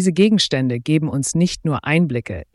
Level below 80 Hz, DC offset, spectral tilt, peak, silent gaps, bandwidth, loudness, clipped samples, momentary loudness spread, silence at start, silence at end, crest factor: -46 dBFS; under 0.1%; -5 dB/octave; -4 dBFS; none; 12 kHz; -18 LUFS; under 0.1%; 7 LU; 0 s; 0.1 s; 14 dB